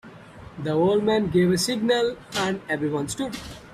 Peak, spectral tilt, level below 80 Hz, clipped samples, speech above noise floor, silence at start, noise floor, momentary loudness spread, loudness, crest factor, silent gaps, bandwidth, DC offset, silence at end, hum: -10 dBFS; -5 dB/octave; -52 dBFS; under 0.1%; 20 dB; 0.05 s; -44 dBFS; 11 LU; -24 LUFS; 14 dB; none; 15 kHz; under 0.1%; 0 s; none